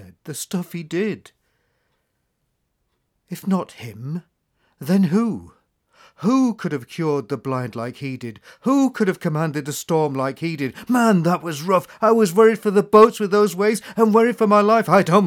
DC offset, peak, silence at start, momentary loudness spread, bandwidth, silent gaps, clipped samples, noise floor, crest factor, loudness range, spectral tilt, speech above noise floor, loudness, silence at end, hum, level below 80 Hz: under 0.1%; -2 dBFS; 0 s; 16 LU; 17.5 kHz; none; under 0.1%; -72 dBFS; 18 dB; 15 LU; -6.5 dB/octave; 53 dB; -19 LUFS; 0 s; none; -66 dBFS